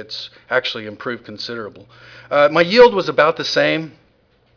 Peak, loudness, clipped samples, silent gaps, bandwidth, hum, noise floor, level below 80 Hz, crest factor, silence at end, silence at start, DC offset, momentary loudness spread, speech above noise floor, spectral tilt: -2 dBFS; -16 LUFS; under 0.1%; none; 5.4 kHz; none; -57 dBFS; -54 dBFS; 16 dB; 0.65 s; 0 s; under 0.1%; 18 LU; 40 dB; -4.5 dB/octave